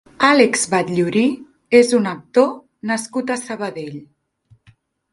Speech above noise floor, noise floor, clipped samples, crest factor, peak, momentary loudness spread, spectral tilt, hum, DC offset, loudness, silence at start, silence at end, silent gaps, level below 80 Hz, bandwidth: 38 dB; -55 dBFS; under 0.1%; 18 dB; 0 dBFS; 17 LU; -4 dB/octave; none; under 0.1%; -17 LUFS; 0.2 s; 1.1 s; none; -62 dBFS; 11.5 kHz